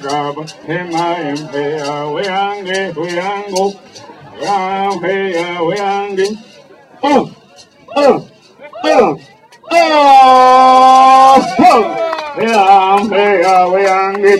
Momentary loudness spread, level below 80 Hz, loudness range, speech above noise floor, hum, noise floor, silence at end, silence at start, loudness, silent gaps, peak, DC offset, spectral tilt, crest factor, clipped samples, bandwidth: 14 LU; -54 dBFS; 11 LU; 29 dB; none; -42 dBFS; 0 s; 0 s; -11 LUFS; none; 0 dBFS; under 0.1%; -4 dB/octave; 12 dB; 0.4%; 13 kHz